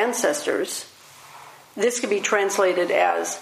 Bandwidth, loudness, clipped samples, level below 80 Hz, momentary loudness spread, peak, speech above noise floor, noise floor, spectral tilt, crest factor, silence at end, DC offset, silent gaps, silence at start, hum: 15.5 kHz; -22 LUFS; under 0.1%; -78 dBFS; 20 LU; -6 dBFS; 24 dB; -46 dBFS; -2 dB/octave; 18 dB; 0 s; under 0.1%; none; 0 s; none